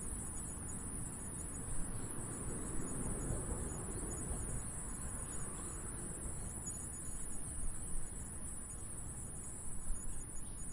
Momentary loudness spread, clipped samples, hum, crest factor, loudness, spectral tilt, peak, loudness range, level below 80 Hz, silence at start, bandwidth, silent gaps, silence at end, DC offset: 4 LU; under 0.1%; none; 16 dB; -43 LUFS; -4.5 dB/octave; -26 dBFS; 3 LU; -48 dBFS; 0 s; 11.5 kHz; none; 0 s; under 0.1%